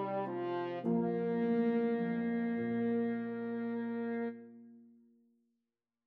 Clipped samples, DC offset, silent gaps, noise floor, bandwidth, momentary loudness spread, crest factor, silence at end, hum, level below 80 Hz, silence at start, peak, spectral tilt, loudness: under 0.1%; under 0.1%; none; -89 dBFS; 4.6 kHz; 7 LU; 14 dB; 1.2 s; none; -84 dBFS; 0 s; -22 dBFS; -7 dB/octave; -35 LUFS